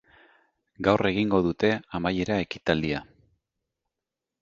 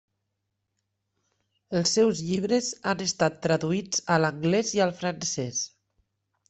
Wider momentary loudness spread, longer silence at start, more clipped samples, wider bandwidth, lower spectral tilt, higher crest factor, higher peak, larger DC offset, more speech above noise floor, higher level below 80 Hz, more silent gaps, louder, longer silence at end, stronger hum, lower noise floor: about the same, 5 LU vs 6 LU; second, 0.8 s vs 1.7 s; neither; second, 7.6 kHz vs 8.4 kHz; first, -6.5 dB/octave vs -4 dB/octave; about the same, 24 dB vs 20 dB; first, -4 dBFS vs -8 dBFS; neither; first, 62 dB vs 55 dB; first, -52 dBFS vs -64 dBFS; neither; about the same, -26 LUFS vs -26 LUFS; first, 1.4 s vs 0.85 s; neither; first, -87 dBFS vs -80 dBFS